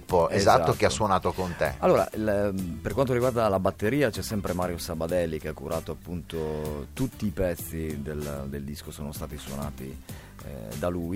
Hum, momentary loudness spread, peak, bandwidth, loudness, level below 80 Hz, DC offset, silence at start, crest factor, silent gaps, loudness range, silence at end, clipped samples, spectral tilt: none; 14 LU; -6 dBFS; 16.5 kHz; -28 LUFS; -46 dBFS; under 0.1%; 0 s; 22 dB; none; 9 LU; 0 s; under 0.1%; -5.5 dB/octave